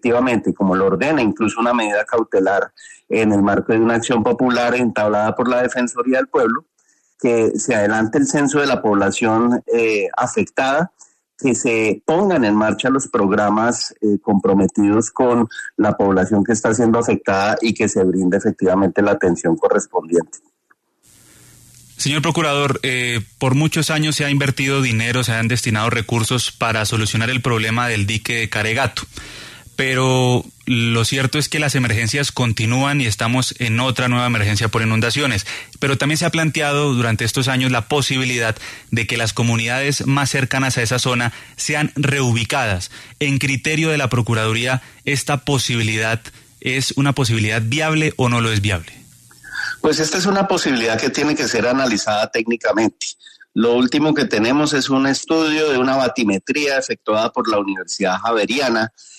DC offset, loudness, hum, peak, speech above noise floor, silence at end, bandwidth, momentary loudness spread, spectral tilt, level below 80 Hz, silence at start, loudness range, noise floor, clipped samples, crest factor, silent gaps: under 0.1%; -17 LUFS; none; -4 dBFS; 44 dB; 0.3 s; 13.5 kHz; 5 LU; -4.5 dB/octave; -50 dBFS; 0.05 s; 2 LU; -61 dBFS; under 0.1%; 14 dB; none